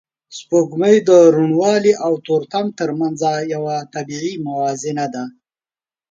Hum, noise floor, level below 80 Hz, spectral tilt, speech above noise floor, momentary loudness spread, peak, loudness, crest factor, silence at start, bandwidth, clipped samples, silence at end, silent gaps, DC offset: none; under -90 dBFS; -66 dBFS; -5.5 dB/octave; over 74 dB; 14 LU; 0 dBFS; -16 LUFS; 16 dB; 0.3 s; 7.8 kHz; under 0.1%; 0.8 s; none; under 0.1%